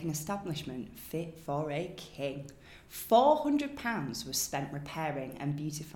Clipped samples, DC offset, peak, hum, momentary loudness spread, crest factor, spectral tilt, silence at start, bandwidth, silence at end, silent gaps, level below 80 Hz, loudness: under 0.1%; under 0.1%; -12 dBFS; none; 16 LU; 22 dB; -4.5 dB/octave; 0 s; 18 kHz; 0 s; none; -62 dBFS; -33 LUFS